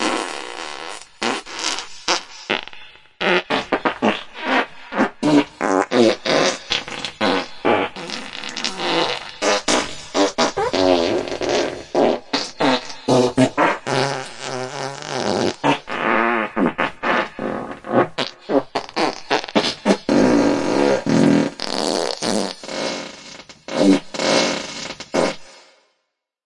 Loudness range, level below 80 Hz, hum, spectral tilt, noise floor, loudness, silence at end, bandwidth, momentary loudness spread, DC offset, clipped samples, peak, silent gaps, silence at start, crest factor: 3 LU; -54 dBFS; none; -4 dB/octave; -75 dBFS; -20 LUFS; 0.85 s; 11.5 kHz; 11 LU; under 0.1%; under 0.1%; -2 dBFS; none; 0 s; 18 dB